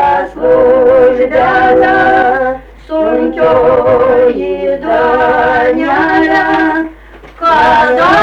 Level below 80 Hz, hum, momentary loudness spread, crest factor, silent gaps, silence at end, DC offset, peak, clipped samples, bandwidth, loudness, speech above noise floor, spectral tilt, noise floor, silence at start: -36 dBFS; none; 8 LU; 8 dB; none; 0 s; under 0.1%; 0 dBFS; under 0.1%; 7.2 kHz; -9 LUFS; 25 dB; -6.5 dB/octave; -33 dBFS; 0 s